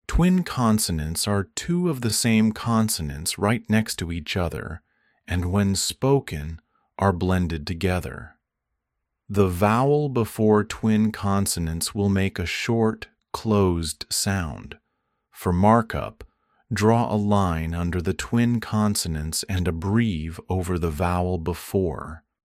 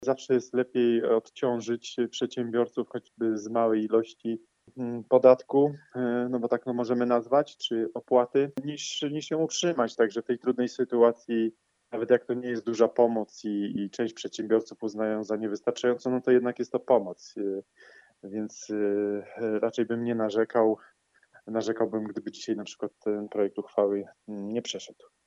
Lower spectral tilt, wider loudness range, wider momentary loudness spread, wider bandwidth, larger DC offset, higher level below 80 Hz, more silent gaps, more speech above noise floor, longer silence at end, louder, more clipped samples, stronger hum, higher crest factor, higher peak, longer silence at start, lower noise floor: about the same, -5.5 dB/octave vs -5 dB/octave; about the same, 3 LU vs 5 LU; about the same, 11 LU vs 11 LU; first, 16 kHz vs 8 kHz; neither; first, -40 dBFS vs -80 dBFS; neither; first, 58 dB vs 34 dB; about the same, 0.25 s vs 0.35 s; first, -23 LUFS vs -28 LUFS; neither; neither; about the same, 20 dB vs 22 dB; about the same, -4 dBFS vs -6 dBFS; about the same, 0.1 s vs 0 s; first, -81 dBFS vs -61 dBFS